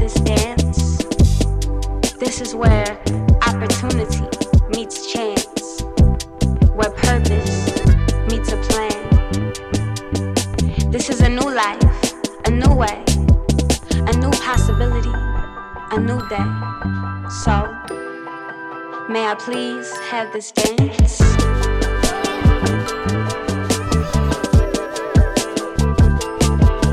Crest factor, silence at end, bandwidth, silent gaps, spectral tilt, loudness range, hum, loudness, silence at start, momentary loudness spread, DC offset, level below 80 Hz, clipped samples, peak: 12 dB; 0 s; 14.5 kHz; none; -5.5 dB/octave; 6 LU; none; -18 LUFS; 0 s; 8 LU; under 0.1%; -20 dBFS; under 0.1%; -4 dBFS